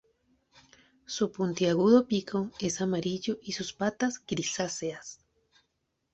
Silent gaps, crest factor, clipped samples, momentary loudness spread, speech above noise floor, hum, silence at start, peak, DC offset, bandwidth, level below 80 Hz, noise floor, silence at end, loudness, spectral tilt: none; 20 dB; under 0.1%; 13 LU; 50 dB; none; 1.1 s; -10 dBFS; under 0.1%; 8.4 kHz; -66 dBFS; -79 dBFS; 1 s; -29 LUFS; -4.5 dB/octave